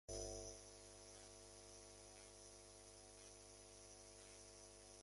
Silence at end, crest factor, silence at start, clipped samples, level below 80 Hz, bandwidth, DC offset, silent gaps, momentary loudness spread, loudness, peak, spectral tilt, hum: 0 s; 22 dB; 0.1 s; under 0.1%; -68 dBFS; 11.5 kHz; under 0.1%; none; 8 LU; -58 LUFS; -38 dBFS; -2.5 dB/octave; 50 Hz at -70 dBFS